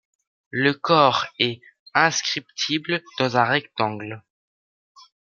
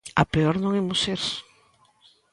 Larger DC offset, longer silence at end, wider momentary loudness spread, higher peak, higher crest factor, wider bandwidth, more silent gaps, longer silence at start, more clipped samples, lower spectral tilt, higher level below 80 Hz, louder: neither; first, 1.15 s vs 0.9 s; first, 14 LU vs 7 LU; about the same, -2 dBFS vs -2 dBFS; about the same, 22 dB vs 22 dB; second, 7.4 kHz vs 11.5 kHz; first, 1.80-1.86 s vs none; first, 0.55 s vs 0.05 s; neither; second, -3.5 dB/octave vs -5 dB/octave; second, -68 dBFS vs -48 dBFS; first, -21 LUFS vs -24 LUFS